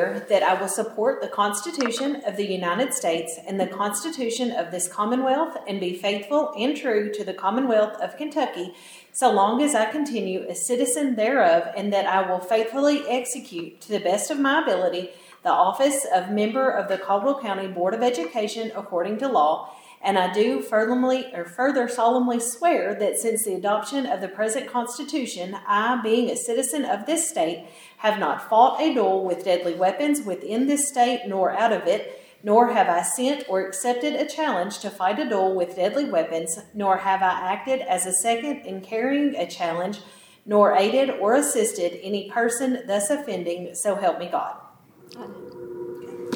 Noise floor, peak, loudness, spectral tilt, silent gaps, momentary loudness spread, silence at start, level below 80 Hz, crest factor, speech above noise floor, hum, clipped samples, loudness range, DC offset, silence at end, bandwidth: -50 dBFS; -4 dBFS; -23 LUFS; -3 dB/octave; none; 9 LU; 0 s; -78 dBFS; 20 dB; 27 dB; none; under 0.1%; 3 LU; under 0.1%; 0 s; over 20 kHz